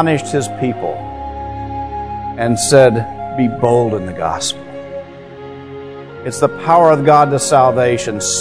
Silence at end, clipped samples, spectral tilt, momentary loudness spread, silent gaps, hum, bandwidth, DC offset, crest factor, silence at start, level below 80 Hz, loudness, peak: 0 s; 0.2%; -4.5 dB/octave; 21 LU; none; none; 11 kHz; 0.6%; 14 dB; 0 s; -40 dBFS; -14 LUFS; 0 dBFS